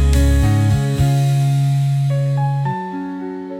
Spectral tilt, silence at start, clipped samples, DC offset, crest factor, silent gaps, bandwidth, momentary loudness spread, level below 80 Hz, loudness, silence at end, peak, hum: -7 dB/octave; 0 s; under 0.1%; under 0.1%; 12 dB; none; 15.5 kHz; 11 LU; -22 dBFS; -17 LUFS; 0 s; -4 dBFS; none